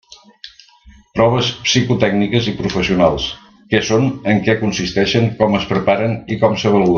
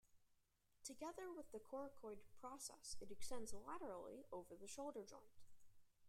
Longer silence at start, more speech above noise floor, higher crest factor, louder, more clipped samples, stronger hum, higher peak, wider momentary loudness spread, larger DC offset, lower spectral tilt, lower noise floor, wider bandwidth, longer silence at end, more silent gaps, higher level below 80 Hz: first, 0.45 s vs 0.05 s; about the same, 31 dB vs 29 dB; about the same, 16 dB vs 18 dB; first, -16 LUFS vs -55 LUFS; neither; neither; first, 0 dBFS vs -36 dBFS; about the same, 5 LU vs 6 LU; neither; first, -5.5 dB/octave vs -3 dB/octave; second, -46 dBFS vs -81 dBFS; second, 7.2 kHz vs 16 kHz; about the same, 0 s vs 0 s; neither; first, -42 dBFS vs -72 dBFS